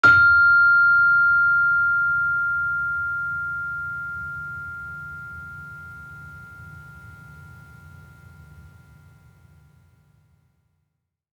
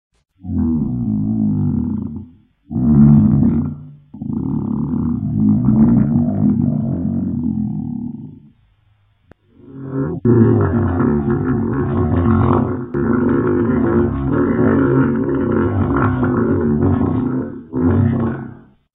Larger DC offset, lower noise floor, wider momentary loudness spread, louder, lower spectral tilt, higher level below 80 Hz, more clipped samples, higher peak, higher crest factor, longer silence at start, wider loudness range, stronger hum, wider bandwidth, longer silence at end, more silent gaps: neither; first, -77 dBFS vs -57 dBFS; first, 26 LU vs 12 LU; about the same, -18 LUFS vs -16 LUFS; second, -4.5 dB/octave vs -14 dB/octave; second, -56 dBFS vs -34 dBFS; neither; second, -4 dBFS vs 0 dBFS; about the same, 18 dB vs 16 dB; second, 0.05 s vs 0.45 s; first, 25 LU vs 4 LU; neither; first, 7.2 kHz vs 3.6 kHz; first, 2.75 s vs 0.4 s; neither